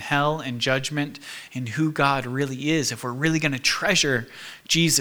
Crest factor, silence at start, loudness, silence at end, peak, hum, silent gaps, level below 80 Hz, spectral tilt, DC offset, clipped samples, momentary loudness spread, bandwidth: 20 dB; 0 s; -23 LUFS; 0 s; -4 dBFS; none; none; -54 dBFS; -3.5 dB/octave; under 0.1%; under 0.1%; 12 LU; over 20 kHz